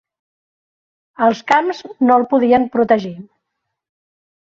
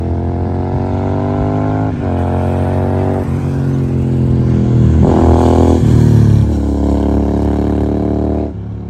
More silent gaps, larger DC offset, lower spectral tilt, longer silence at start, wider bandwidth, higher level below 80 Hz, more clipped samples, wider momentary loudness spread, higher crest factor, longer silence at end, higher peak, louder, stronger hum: neither; neither; second, -6 dB/octave vs -9.5 dB/octave; first, 1.2 s vs 0 s; second, 7.4 kHz vs 9.4 kHz; second, -60 dBFS vs -20 dBFS; neither; about the same, 5 LU vs 7 LU; about the same, 16 dB vs 12 dB; first, 1.3 s vs 0 s; about the same, -2 dBFS vs 0 dBFS; about the same, -15 LUFS vs -13 LUFS; neither